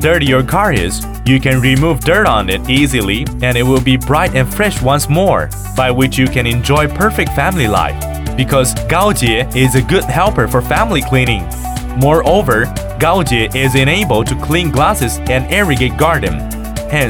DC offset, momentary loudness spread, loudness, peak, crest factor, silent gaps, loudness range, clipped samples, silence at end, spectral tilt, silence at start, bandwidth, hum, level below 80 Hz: under 0.1%; 6 LU; -12 LUFS; 0 dBFS; 12 dB; none; 1 LU; under 0.1%; 0 s; -5 dB/octave; 0 s; 19 kHz; none; -24 dBFS